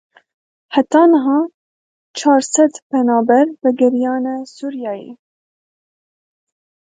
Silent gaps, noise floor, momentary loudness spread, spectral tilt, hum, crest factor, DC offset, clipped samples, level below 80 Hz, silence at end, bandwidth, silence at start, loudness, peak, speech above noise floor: 1.54-2.14 s, 2.82-2.90 s; under -90 dBFS; 14 LU; -3.5 dB/octave; none; 16 dB; under 0.1%; under 0.1%; -70 dBFS; 1.7 s; 9.4 kHz; 0.7 s; -15 LUFS; 0 dBFS; over 76 dB